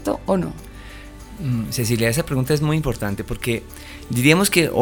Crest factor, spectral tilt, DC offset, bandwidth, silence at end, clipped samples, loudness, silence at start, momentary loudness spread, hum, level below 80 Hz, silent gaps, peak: 20 dB; -5 dB/octave; under 0.1%; over 20 kHz; 0 s; under 0.1%; -20 LUFS; 0 s; 23 LU; none; -38 dBFS; none; 0 dBFS